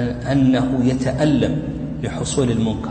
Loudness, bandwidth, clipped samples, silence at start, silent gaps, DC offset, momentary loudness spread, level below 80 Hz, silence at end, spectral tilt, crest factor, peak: -19 LUFS; 9.2 kHz; under 0.1%; 0 s; none; under 0.1%; 9 LU; -36 dBFS; 0 s; -6.5 dB/octave; 12 dB; -6 dBFS